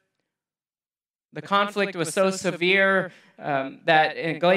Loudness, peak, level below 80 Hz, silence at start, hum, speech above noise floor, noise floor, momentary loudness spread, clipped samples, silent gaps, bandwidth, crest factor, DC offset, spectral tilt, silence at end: -22 LUFS; -4 dBFS; -78 dBFS; 1.35 s; none; over 67 dB; under -90 dBFS; 15 LU; under 0.1%; none; 15 kHz; 20 dB; under 0.1%; -4 dB/octave; 0 s